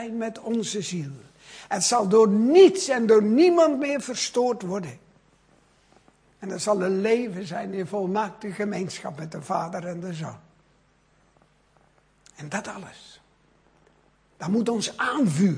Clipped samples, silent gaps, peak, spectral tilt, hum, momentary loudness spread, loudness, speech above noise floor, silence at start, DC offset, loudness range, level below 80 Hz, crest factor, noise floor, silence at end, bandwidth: under 0.1%; none; -4 dBFS; -5 dB/octave; none; 19 LU; -23 LUFS; 39 dB; 0 s; under 0.1%; 20 LU; -68 dBFS; 20 dB; -62 dBFS; 0 s; 10.5 kHz